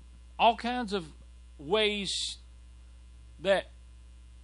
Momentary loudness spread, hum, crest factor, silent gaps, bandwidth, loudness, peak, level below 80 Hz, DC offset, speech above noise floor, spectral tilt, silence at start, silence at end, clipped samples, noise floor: 21 LU; none; 20 dB; none; 11 kHz; -29 LUFS; -12 dBFS; -52 dBFS; under 0.1%; 22 dB; -3.5 dB/octave; 0 s; 0 s; under 0.1%; -51 dBFS